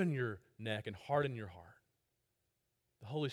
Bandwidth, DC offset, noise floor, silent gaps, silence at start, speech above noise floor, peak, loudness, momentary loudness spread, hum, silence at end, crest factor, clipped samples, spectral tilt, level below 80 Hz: 12.5 kHz; under 0.1%; -84 dBFS; none; 0 s; 45 dB; -20 dBFS; -40 LUFS; 17 LU; none; 0 s; 20 dB; under 0.1%; -7 dB/octave; -74 dBFS